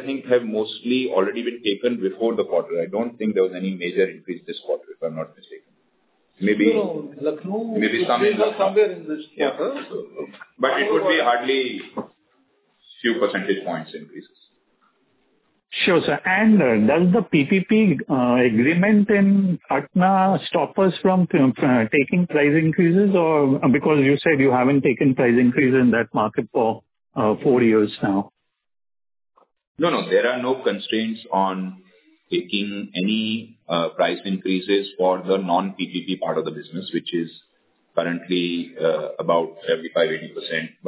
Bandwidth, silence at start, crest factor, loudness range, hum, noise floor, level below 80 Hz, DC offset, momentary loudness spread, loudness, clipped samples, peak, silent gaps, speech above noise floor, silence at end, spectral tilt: 4 kHz; 0 s; 16 dB; 8 LU; none; -66 dBFS; -62 dBFS; under 0.1%; 11 LU; -20 LUFS; under 0.1%; -6 dBFS; 29.67-29.75 s; 46 dB; 0 s; -10.5 dB/octave